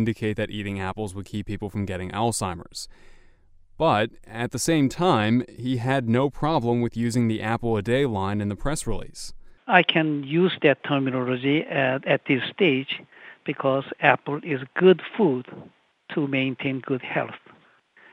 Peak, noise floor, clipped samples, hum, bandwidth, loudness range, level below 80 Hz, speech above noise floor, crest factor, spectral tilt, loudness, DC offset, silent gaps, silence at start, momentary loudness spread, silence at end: 0 dBFS; -57 dBFS; under 0.1%; none; 15.5 kHz; 5 LU; -46 dBFS; 33 dB; 24 dB; -5.5 dB/octave; -24 LUFS; under 0.1%; none; 0 s; 13 LU; 0.75 s